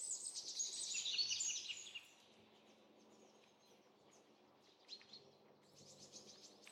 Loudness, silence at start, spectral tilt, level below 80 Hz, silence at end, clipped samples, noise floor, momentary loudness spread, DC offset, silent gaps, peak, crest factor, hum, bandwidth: -43 LUFS; 0 s; 2 dB/octave; under -90 dBFS; 0 s; under 0.1%; -70 dBFS; 26 LU; under 0.1%; none; -30 dBFS; 22 dB; none; 16 kHz